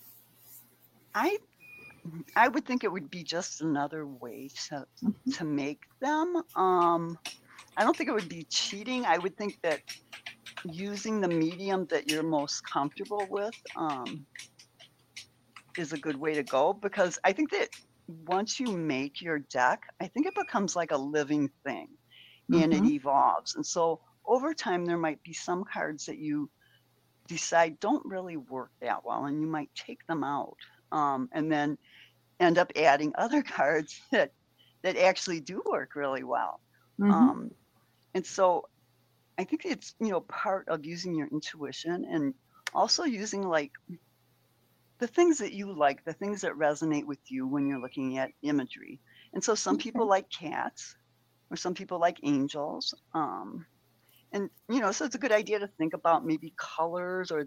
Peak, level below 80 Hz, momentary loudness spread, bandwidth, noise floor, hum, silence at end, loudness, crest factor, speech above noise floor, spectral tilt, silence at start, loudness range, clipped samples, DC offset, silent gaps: -8 dBFS; -76 dBFS; 16 LU; 16.5 kHz; -69 dBFS; none; 0 s; -30 LUFS; 24 dB; 39 dB; -4.5 dB/octave; 0.05 s; 5 LU; under 0.1%; under 0.1%; none